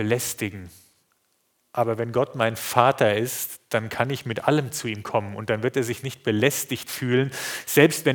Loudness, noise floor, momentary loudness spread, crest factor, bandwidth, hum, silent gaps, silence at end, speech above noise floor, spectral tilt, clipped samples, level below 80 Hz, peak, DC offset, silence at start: -24 LUFS; -69 dBFS; 10 LU; 24 dB; over 20 kHz; none; none; 0 s; 46 dB; -4.5 dB/octave; under 0.1%; -66 dBFS; 0 dBFS; under 0.1%; 0 s